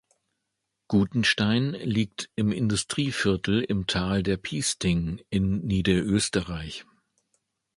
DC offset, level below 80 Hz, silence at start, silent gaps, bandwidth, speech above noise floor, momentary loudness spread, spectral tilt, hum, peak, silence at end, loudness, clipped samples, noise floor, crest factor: under 0.1%; -46 dBFS; 0.9 s; none; 11.5 kHz; 56 dB; 6 LU; -5 dB/octave; none; -8 dBFS; 0.95 s; -26 LUFS; under 0.1%; -81 dBFS; 18 dB